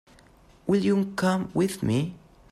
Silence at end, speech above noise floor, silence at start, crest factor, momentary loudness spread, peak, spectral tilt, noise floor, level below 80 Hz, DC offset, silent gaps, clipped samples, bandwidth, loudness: 0.35 s; 31 dB; 0.65 s; 16 dB; 7 LU; -12 dBFS; -6.5 dB/octave; -55 dBFS; -56 dBFS; under 0.1%; none; under 0.1%; 14.5 kHz; -26 LUFS